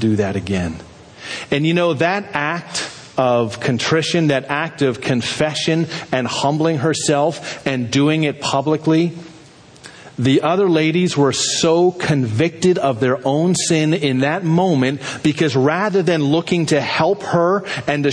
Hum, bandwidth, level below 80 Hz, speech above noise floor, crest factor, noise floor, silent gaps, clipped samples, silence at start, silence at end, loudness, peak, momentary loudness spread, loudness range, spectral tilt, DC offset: none; 10.5 kHz; -52 dBFS; 26 dB; 16 dB; -43 dBFS; none; under 0.1%; 0 s; 0 s; -17 LUFS; -2 dBFS; 6 LU; 3 LU; -5 dB/octave; under 0.1%